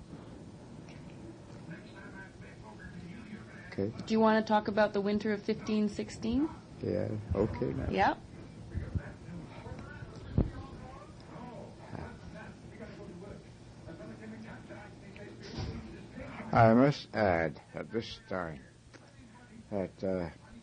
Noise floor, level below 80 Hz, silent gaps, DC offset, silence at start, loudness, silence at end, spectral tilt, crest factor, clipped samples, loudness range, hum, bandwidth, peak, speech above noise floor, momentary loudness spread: -56 dBFS; -52 dBFS; none; under 0.1%; 0 s; -32 LUFS; 0 s; -7 dB/octave; 22 dB; under 0.1%; 17 LU; none; 10 kHz; -12 dBFS; 25 dB; 21 LU